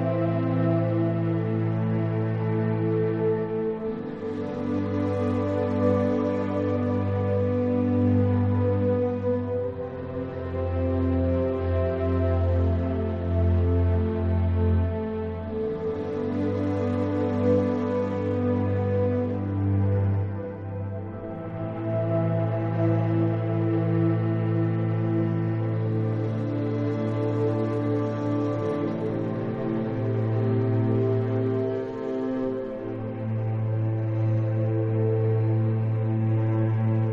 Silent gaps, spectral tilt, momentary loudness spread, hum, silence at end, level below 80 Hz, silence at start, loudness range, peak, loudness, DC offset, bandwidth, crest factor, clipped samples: none; -10.5 dB/octave; 7 LU; none; 0 s; -44 dBFS; 0 s; 3 LU; -12 dBFS; -26 LUFS; under 0.1%; 4.6 kHz; 14 dB; under 0.1%